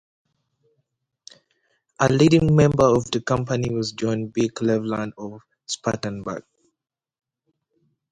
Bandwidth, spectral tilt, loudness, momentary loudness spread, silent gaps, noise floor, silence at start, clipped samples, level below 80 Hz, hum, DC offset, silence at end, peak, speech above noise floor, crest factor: 10 kHz; -6 dB/octave; -21 LUFS; 16 LU; none; -82 dBFS; 2 s; under 0.1%; -50 dBFS; none; under 0.1%; 1.7 s; -4 dBFS; 61 dB; 20 dB